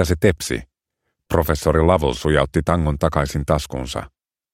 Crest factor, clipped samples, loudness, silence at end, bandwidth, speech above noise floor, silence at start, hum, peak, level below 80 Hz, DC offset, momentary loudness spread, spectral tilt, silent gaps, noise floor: 20 dB; under 0.1%; -20 LUFS; 0.45 s; 16.5 kHz; 58 dB; 0 s; none; 0 dBFS; -30 dBFS; under 0.1%; 10 LU; -6 dB/octave; none; -77 dBFS